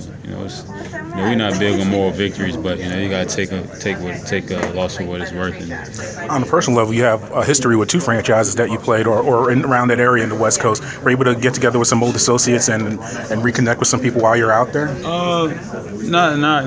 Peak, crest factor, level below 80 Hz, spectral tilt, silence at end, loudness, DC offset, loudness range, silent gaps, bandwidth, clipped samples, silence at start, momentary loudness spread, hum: 0 dBFS; 16 dB; -42 dBFS; -4.5 dB/octave; 0 s; -16 LUFS; under 0.1%; 6 LU; none; 8 kHz; under 0.1%; 0 s; 12 LU; none